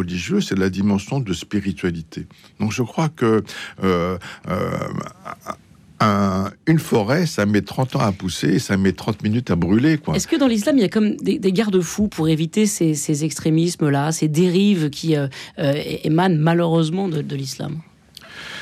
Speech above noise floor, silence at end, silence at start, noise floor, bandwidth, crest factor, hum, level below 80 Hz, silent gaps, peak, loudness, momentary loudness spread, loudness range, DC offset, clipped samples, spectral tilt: 23 dB; 0 s; 0 s; -42 dBFS; 15.5 kHz; 12 dB; none; -50 dBFS; none; -8 dBFS; -20 LUFS; 12 LU; 4 LU; under 0.1%; under 0.1%; -6 dB/octave